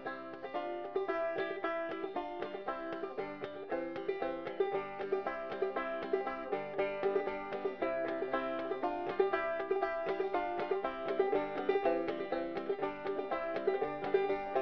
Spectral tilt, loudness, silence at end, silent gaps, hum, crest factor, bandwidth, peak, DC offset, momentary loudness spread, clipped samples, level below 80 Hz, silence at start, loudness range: -3 dB/octave; -37 LUFS; 0 s; none; none; 20 dB; 5.4 kHz; -18 dBFS; 0.1%; 7 LU; under 0.1%; -68 dBFS; 0 s; 4 LU